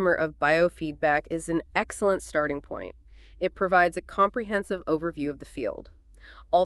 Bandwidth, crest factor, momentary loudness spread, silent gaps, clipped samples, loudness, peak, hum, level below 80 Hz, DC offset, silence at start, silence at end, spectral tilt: 12.5 kHz; 18 dB; 11 LU; none; under 0.1%; -26 LUFS; -8 dBFS; none; -50 dBFS; under 0.1%; 0 s; 0 s; -5 dB/octave